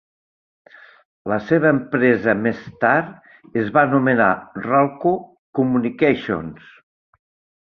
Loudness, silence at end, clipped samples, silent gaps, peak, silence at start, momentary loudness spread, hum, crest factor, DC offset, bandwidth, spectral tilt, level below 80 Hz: -19 LUFS; 1.2 s; under 0.1%; 5.39-5.53 s; -2 dBFS; 1.25 s; 10 LU; none; 18 dB; under 0.1%; 6.2 kHz; -9 dB/octave; -56 dBFS